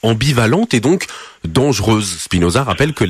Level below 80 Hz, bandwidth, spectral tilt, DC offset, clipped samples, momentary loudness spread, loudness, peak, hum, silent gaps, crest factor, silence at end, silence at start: -36 dBFS; 14 kHz; -5 dB/octave; under 0.1%; under 0.1%; 5 LU; -15 LUFS; -2 dBFS; none; none; 14 dB; 0 s; 0.05 s